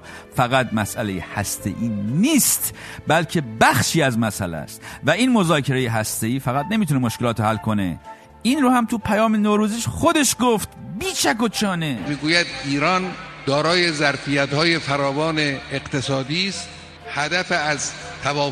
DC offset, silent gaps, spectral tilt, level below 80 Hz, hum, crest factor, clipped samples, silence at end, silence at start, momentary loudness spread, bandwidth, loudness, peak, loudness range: under 0.1%; none; -4 dB/octave; -48 dBFS; none; 20 dB; under 0.1%; 0 s; 0.05 s; 10 LU; 14 kHz; -20 LUFS; 0 dBFS; 2 LU